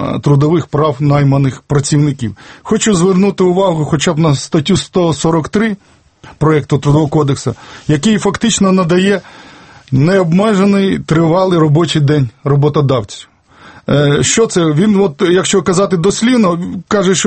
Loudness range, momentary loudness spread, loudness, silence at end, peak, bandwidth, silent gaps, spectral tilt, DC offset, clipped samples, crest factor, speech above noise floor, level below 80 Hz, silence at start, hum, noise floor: 2 LU; 6 LU; -12 LUFS; 0 s; 0 dBFS; 8.8 kHz; none; -5.5 dB/octave; under 0.1%; under 0.1%; 12 dB; 28 dB; -40 dBFS; 0 s; none; -39 dBFS